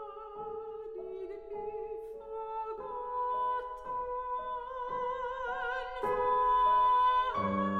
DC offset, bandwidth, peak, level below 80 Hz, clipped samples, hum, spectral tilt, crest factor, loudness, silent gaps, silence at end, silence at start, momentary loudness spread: under 0.1%; 6.4 kHz; -20 dBFS; -58 dBFS; under 0.1%; none; -6.5 dB/octave; 14 dB; -33 LUFS; none; 0 s; 0 s; 16 LU